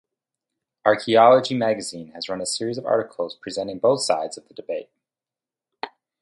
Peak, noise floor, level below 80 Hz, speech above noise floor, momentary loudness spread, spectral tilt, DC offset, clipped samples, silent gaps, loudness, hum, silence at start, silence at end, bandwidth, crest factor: -2 dBFS; under -90 dBFS; -68 dBFS; over 69 dB; 19 LU; -4 dB/octave; under 0.1%; under 0.1%; none; -21 LUFS; none; 0.85 s; 0.35 s; 11.5 kHz; 22 dB